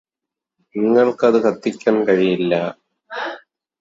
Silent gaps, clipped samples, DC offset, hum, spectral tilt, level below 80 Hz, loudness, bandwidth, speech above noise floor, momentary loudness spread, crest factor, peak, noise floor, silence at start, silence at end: none; under 0.1%; under 0.1%; none; -6.5 dB/octave; -64 dBFS; -18 LUFS; 7.8 kHz; 69 dB; 14 LU; 18 dB; -2 dBFS; -85 dBFS; 0.75 s; 0.45 s